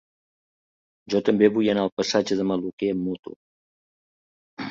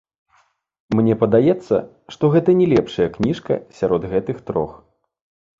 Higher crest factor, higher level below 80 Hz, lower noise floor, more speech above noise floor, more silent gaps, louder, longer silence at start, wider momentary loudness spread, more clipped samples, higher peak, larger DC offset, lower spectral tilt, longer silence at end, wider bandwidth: about the same, 20 dB vs 18 dB; second, -62 dBFS vs -48 dBFS; first, under -90 dBFS vs -61 dBFS; first, over 67 dB vs 43 dB; first, 1.92-1.97 s, 2.73-2.78 s, 3.19-3.23 s, 3.36-4.57 s vs none; second, -23 LUFS vs -19 LUFS; first, 1.05 s vs 0.9 s; first, 14 LU vs 9 LU; neither; second, -6 dBFS vs -2 dBFS; neither; second, -5.5 dB/octave vs -8.5 dB/octave; second, 0 s vs 0.85 s; about the same, 7.6 kHz vs 7.6 kHz